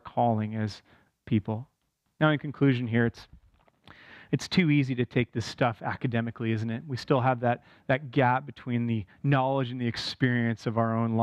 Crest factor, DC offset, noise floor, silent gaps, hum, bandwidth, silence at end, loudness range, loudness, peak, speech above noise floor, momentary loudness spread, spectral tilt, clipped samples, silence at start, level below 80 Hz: 18 dB; under 0.1%; -59 dBFS; none; none; 10 kHz; 0 s; 2 LU; -28 LUFS; -10 dBFS; 32 dB; 8 LU; -7 dB/octave; under 0.1%; 0.05 s; -62 dBFS